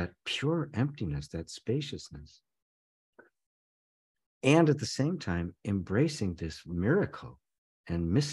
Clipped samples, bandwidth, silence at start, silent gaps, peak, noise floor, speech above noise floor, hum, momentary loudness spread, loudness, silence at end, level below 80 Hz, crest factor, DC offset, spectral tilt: under 0.1%; 12 kHz; 0 s; 2.62-3.13 s, 3.46-4.15 s, 4.26-4.41 s, 7.58-7.84 s; -8 dBFS; under -90 dBFS; over 60 dB; none; 15 LU; -31 LUFS; 0 s; -54 dBFS; 24 dB; under 0.1%; -6 dB/octave